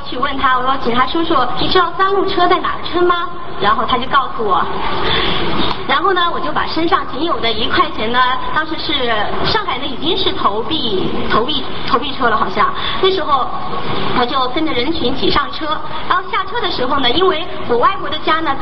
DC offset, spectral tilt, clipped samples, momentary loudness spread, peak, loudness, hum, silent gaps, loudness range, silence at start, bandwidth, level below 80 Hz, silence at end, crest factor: 10%; -7 dB/octave; under 0.1%; 5 LU; 0 dBFS; -16 LUFS; none; none; 2 LU; 0 s; 6 kHz; -36 dBFS; 0 s; 16 dB